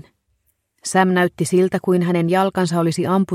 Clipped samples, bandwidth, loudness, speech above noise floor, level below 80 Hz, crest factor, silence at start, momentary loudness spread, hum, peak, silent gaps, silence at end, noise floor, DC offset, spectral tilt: under 0.1%; 14.5 kHz; -18 LUFS; 50 dB; -60 dBFS; 16 dB; 0.85 s; 3 LU; none; -4 dBFS; none; 0 s; -67 dBFS; under 0.1%; -6 dB/octave